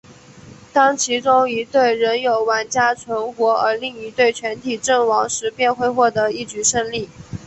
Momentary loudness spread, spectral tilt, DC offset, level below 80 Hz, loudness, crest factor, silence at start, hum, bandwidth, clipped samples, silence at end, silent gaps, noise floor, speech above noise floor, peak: 9 LU; -2.5 dB/octave; under 0.1%; -54 dBFS; -18 LUFS; 16 dB; 0.1 s; none; 8.6 kHz; under 0.1%; 0 s; none; -42 dBFS; 24 dB; -2 dBFS